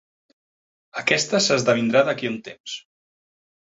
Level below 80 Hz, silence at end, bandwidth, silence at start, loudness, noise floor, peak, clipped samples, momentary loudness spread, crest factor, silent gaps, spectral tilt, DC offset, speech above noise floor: -66 dBFS; 1 s; 8 kHz; 0.95 s; -20 LUFS; under -90 dBFS; -2 dBFS; under 0.1%; 16 LU; 22 dB; 2.60-2.64 s; -3.5 dB/octave; under 0.1%; over 69 dB